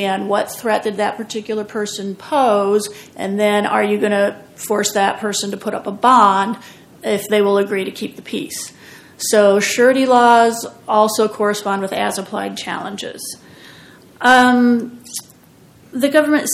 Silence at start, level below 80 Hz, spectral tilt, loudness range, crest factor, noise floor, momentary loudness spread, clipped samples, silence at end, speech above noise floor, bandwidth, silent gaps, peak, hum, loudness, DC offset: 0 s; -62 dBFS; -3.5 dB/octave; 5 LU; 16 dB; -47 dBFS; 16 LU; under 0.1%; 0 s; 31 dB; 16.5 kHz; none; 0 dBFS; none; -16 LUFS; under 0.1%